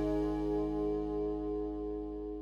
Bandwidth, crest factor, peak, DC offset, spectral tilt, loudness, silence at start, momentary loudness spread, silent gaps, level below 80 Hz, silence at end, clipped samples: 6.8 kHz; 12 dB; -24 dBFS; under 0.1%; -9 dB/octave; -36 LUFS; 0 s; 6 LU; none; -46 dBFS; 0 s; under 0.1%